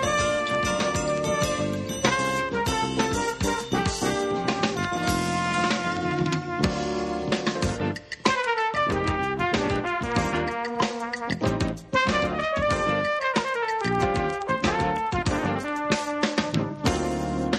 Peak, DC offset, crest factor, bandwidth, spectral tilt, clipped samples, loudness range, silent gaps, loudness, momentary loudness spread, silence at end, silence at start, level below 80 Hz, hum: -4 dBFS; under 0.1%; 20 dB; 13.5 kHz; -4.5 dB/octave; under 0.1%; 1 LU; none; -25 LUFS; 3 LU; 0 s; 0 s; -42 dBFS; none